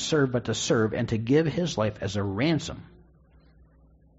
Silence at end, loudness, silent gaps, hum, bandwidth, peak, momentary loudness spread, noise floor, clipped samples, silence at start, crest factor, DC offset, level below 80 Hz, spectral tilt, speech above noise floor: 1.35 s; -26 LUFS; none; none; 8 kHz; -10 dBFS; 6 LU; -57 dBFS; under 0.1%; 0 s; 16 dB; under 0.1%; -52 dBFS; -5.5 dB/octave; 32 dB